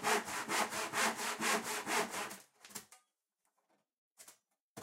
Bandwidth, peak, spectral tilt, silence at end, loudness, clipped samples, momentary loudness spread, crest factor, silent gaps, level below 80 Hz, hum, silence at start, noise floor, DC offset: 16 kHz; -20 dBFS; -1 dB/octave; 0 s; -36 LUFS; under 0.1%; 16 LU; 20 dB; 3.98-4.16 s, 4.61-4.75 s; -82 dBFS; none; 0 s; -85 dBFS; under 0.1%